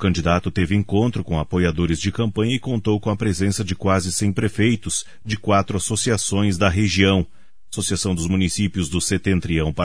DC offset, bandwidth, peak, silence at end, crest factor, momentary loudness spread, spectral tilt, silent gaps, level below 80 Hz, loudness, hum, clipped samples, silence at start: 1%; 11 kHz; -2 dBFS; 0 s; 18 dB; 5 LU; -5 dB/octave; none; -38 dBFS; -20 LUFS; none; under 0.1%; 0 s